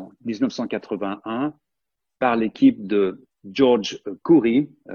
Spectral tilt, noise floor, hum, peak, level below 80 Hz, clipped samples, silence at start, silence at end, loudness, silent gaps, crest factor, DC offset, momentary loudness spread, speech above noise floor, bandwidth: -6.5 dB/octave; -85 dBFS; none; -4 dBFS; -62 dBFS; under 0.1%; 0 s; 0 s; -21 LUFS; none; 18 dB; under 0.1%; 12 LU; 64 dB; 7 kHz